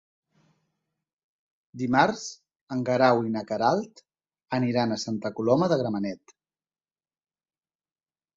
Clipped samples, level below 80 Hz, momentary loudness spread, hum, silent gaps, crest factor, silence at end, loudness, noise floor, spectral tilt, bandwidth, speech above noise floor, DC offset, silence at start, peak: under 0.1%; -68 dBFS; 12 LU; none; 2.61-2.67 s; 22 dB; 2.2 s; -26 LUFS; under -90 dBFS; -6 dB/octave; 7.8 kHz; over 65 dB; under 0.1%; 1.75 s; -6 dBFS